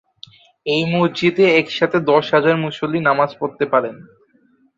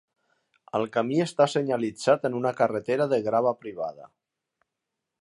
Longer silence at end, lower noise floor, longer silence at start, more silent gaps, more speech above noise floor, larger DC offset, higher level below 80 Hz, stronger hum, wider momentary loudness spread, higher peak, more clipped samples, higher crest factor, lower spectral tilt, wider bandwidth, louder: second, 0.75 s vs 1.15 s; second, -57 dBFS vs -85 dBFS; about the same, 0.65 s vs 0.75 s; neither; second, 40 dB vs 60 dB; neither; first, -60 dBFS vs -74 dBFS; neither; about the same, 7 LU vs 9 LU; first, -2 dBFS vs -6 dBFS; neither; about the same, 16 dB vs 20 dB; about the same, -6.5 dB/octave vs -6 dB/octave; second, 7.8 kHz vs 11 kHz; first, -17 LUFS vs -26 LUFS